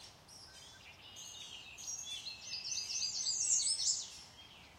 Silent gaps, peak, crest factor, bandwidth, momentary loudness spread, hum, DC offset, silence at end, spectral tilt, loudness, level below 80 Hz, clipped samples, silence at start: none; -20 dBFS; 22 dB; 16.5 kHz; 23 LU; none; under 0.1%; 0 s; 2 dB/octave; -36 LUFS; -74 dBFS; under 0.1%; 0 s